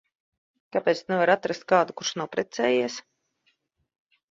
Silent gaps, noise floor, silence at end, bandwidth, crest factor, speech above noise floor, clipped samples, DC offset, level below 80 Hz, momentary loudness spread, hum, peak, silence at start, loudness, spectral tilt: none; -71 dBFS; 1.3 s; 7.8 kHz; 22 dB; 47 dB; under 0.1%; under 0.1%; -72 dBFS; 8 LU; none; -6 dBFS; 0.75 s; -25 LUFS; -4 dB/octave